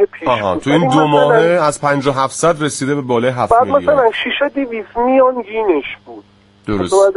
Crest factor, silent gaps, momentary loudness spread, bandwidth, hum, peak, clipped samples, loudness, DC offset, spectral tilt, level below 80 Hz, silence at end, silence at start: 14 dB; none; 9 LU; 11.5 kHz; none; 0 dBFS; under 0.1%; -14 LUFS; under 0.1%; -5 dB/octave; -44 dBFS; 0 s; 0 s